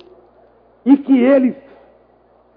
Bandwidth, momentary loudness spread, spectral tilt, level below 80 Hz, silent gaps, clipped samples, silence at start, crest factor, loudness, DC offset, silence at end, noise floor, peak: 3.8 kHz; 12 LU; -10.5 dB/octave; -62 dBFS; none; under 0.1%; 0.85 s; 16 dB; -14 LUFS; under 0.1%; 1.05 s; -52 dBFS; 0 dBFS